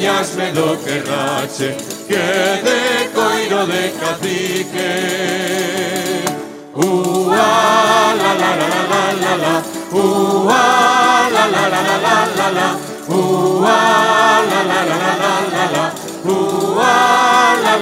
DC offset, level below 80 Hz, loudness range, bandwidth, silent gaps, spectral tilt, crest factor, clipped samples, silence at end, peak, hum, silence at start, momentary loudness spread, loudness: under 0.1%; -62 dBFS; 4 LU; 16 kHz; none; -3.5 dB/octave; 14 dB; under 0.1%; 0 s; 0 dBFS; none; 0 s; 8 LU; -14 LUFS